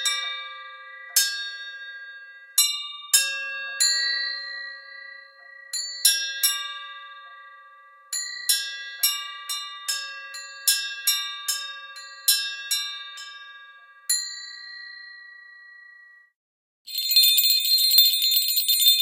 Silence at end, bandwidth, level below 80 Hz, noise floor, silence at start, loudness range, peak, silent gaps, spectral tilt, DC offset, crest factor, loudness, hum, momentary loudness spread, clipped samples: 0 s; 17 kHz; -88 dBFS; -51 dBFS; 0 s; 11 LU; -2 dBFS; 16.35-16.85 s; 7 dB/octave; under 0.1%; 24 dB; -21 LUFS; none; 23 LU; under 0.1%